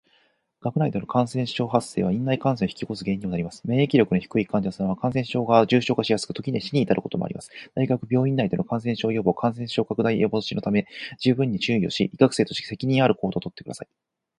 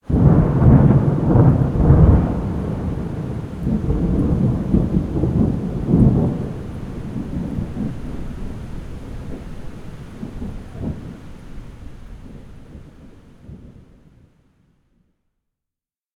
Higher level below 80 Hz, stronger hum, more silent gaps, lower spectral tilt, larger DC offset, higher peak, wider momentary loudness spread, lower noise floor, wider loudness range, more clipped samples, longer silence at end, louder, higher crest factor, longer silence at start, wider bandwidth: second, -56 dBFS vs -26 dBFS; neither; neither; second, -6.5 dB/octave vs -10.5 dB/octave; neither; about the same, -2 dBFS vs 0 dBFS; second, 9 LU vs 23 LU; second, -65 dBFS vs -88 dBFS; second, 2 LU vs 19 LU; neither; second, 0.55 s vs 2.45 s; second, -24 LUFS vs -18 LUFS; about the same, 22 dB vs 18 dB; first, 0.65 s vs 0.1 s; first, 11.5 kHz vs 6.8 kHz